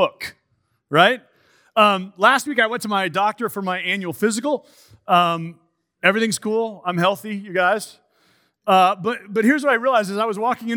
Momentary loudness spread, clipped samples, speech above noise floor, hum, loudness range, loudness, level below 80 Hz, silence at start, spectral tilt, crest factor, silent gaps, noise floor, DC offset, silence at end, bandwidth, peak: 11 LU; under 0.1%; 49 dB; none; 3 LU; -19 LUFS; -72 dBFS; 0 s; -4 dB/octave; 20 dB; none; -68 dBFS; under 0.1%; 0 s; over 20 kHz; 0 dBFS